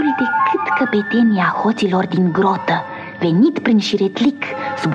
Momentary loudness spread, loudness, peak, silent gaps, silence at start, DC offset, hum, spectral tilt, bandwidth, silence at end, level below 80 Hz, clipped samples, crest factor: 7 LU; -16 LUFS; -4 dBFS; none; 0 s; under 0.1%; none; -6.5 dB/octave; 9.2 kHz; 0 s; -62 dBFS; under 0.1%; 12 dB